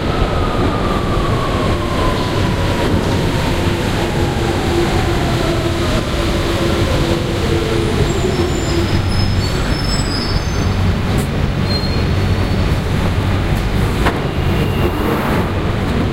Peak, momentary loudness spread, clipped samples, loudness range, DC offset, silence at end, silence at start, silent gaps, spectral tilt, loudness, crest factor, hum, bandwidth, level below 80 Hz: 0 dBFS; 2 LU; under 0.1%; 1 LU; under 0.1%; 0 s; 0 s; none; -6 dB/octave; -16 LUFS; 14 dB; none; 16 kHz; -22 dBFS